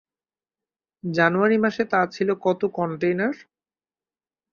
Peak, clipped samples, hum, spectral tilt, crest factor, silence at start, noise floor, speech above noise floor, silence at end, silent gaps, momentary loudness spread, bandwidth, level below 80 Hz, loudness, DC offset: -4 dBFS; under 0.1%; none; -7 dB/octave; 20 dB; 1.05 s; under -90 dBFS; over 68 dB; 1.1 s; none; 9 LU; 7 kHz; -68 dBFS; -22 LUFS; under 0.1%